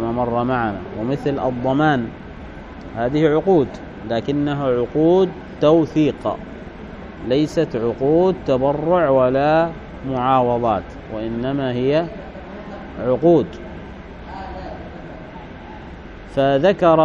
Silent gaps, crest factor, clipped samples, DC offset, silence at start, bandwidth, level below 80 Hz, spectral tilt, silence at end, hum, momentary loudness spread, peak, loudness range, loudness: none; 18 dB; under 0.1%; under 0.1%; 0 s; 7.8 kHz; -42 dBFS; -8 dB/octave; 0 s; none; 20 LU; -2 dBFS; 5 LU; -19 LUFS